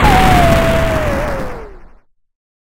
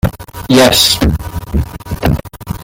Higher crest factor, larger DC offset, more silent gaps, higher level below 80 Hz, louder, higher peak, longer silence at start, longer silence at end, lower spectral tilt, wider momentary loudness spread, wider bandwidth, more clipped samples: about the same, 14 dB vs 14 dB; neither; neither; about the same, -20 dBFS vs -24 dBFS; about the same, -13 LUFS vs -12 LUFS; about the same, 0 dBFS vs 0 dBFS; about the same, 0 s vs 0.05 s; first, 0.9 s vs 0 s; first, -5.5 dB/octave vs -4 dB/octave; about the same, 16 LU vs 15 LU; about the same, 17 kHz vs 17.5 kHz; neither